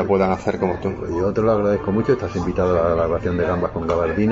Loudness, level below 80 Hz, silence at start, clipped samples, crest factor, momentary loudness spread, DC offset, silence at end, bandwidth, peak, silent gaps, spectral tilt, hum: -20 LUFS; -38 dBFS; 0 s; under 0.1%; 14 dB; 4 LU; under 0.1%; 0 s; 8 kHz; -4 dBFS; none; -8 dB/octave; none